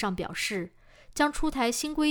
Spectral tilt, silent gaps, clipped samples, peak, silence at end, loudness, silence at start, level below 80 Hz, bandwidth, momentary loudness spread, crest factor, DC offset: -3.5 dB/octave; none; under 0.1%; -10 dBFS; 0 s; -29 LUFS; 0 s; -44 dBFS; over 20 kHz; 11 LU; 18 dB; under 0.1%